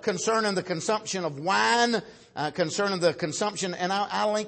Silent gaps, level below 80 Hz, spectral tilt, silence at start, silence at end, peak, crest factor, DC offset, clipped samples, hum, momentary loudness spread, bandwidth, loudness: none; -70 dBFS; -3.5 dB/octave; 0 s; 0 s; -10 dBFS; 18 dB; under 0.1%; under 0.1%; none; 8 LU; 8.8 kHz; -26 LUFS